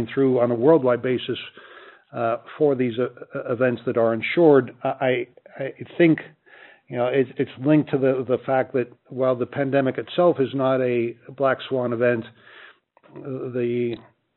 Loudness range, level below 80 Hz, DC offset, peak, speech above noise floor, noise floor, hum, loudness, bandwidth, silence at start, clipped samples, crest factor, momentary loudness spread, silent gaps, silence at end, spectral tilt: 3 LU; -70 dBFS; under 0.1%; -4 dBFS; 29 dB; -51 dBFS; none; -22 LUFS; 4.2 kHz; 0 s; under 0.1%; 18 dB; 14 LU; none; 0.35 s; -5.5 dB/octave